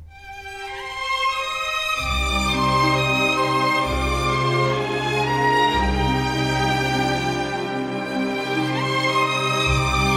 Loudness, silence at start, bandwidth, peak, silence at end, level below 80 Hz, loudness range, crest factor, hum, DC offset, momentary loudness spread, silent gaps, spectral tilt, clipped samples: -21 LUFS; 0 s; 16 kHz; -6 dBFS; 0 s; -34 dBFS; 2 LU; 14 dB; none; under 0.1%; 7 LU; none; -4.5 dB/octave; under 0.1%